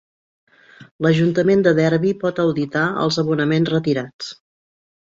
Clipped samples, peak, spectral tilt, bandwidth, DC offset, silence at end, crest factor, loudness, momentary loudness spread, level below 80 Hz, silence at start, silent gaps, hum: under 0.1%; -4 dBFS; -6.5 dB/octave; 7.6 kHz; under 0.1%; 0.8 s; 16 dB; -18 LUFS; 8 LU; -58 dBFS; 0.8 s; 0.91-0.99 s, 4.13-4.19 s; none